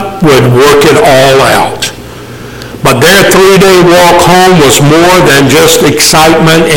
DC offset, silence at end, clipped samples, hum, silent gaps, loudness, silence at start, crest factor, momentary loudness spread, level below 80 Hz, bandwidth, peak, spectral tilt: under 0.1%; 0 s; 2%; none; none; -3 LUFS; 0 s; 4 dB; 12 LU; -28 dBFS; over 20 kHz; 0 dBFS; -4 dB/octave